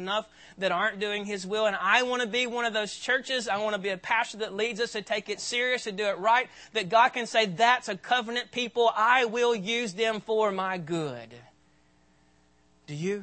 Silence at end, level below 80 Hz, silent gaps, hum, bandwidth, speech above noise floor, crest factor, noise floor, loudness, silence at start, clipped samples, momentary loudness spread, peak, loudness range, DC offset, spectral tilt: 0 s; -72 dBFS; none; none; 8.8 kHz; 37 dB; 20 dB; -64 dBFS; -27 LUFS; 0 s; under 0.1%; 9 LU; -8 dBFS; 5 LU; under 0.1%; -3 dB/octave